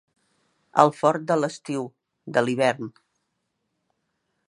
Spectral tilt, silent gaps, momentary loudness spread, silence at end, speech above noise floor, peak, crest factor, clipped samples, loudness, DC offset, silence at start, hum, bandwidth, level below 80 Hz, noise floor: -5.5 dB/octave; none; 14 LU; 1.6 s; 55 dB; 0 dBFS; 26 dB; under 0.1%; -23 LUFS; under 0.1%; 0.75 s; none; 11.5 kHz; -74 dBFS; -77 dBFS